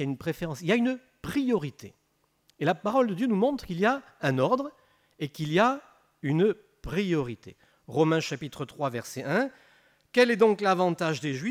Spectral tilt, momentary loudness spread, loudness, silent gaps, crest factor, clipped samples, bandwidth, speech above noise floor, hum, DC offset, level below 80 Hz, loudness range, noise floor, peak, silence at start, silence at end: -6 dB/octave; 13 LU; -27 LUFS; none; 20 dB; under 0.1%; 15.5 kHz; 45 dB; none; under 0.1%; -58 dBFS; 3 LU; -71 dBFS; -8 dBFS; 0 s; 0 s